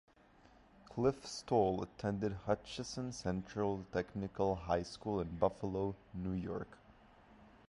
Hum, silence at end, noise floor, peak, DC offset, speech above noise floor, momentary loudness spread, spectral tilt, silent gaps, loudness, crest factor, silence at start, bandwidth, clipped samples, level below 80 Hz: none; 0.2 s; -65 dBFS; -16 dBFS; under 0.1%; 27 dB; 9 LU; -6.5 dB/octave; none; -39 LUFS; 22 dB; 0.8 s; 11.5 kHz; under 0.1%; -58 dBFS